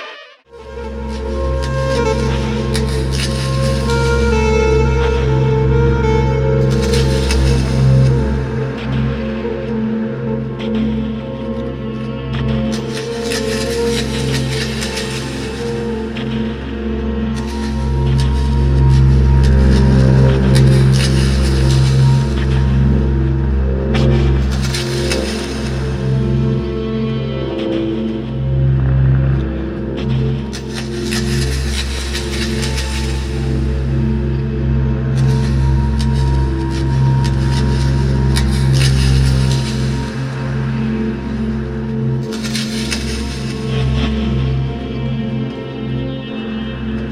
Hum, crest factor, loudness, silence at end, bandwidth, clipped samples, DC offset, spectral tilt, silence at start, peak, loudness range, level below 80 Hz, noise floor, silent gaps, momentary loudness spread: none; 14 dB; -16 LUFS; 0 s; 12.5 kHz; under 0.1%; under 0.1%; -6.5 dB/octave; 0 s; 0 dBFS; 7 LU; -20 dBFS; -37 dBFS; none; 10 LU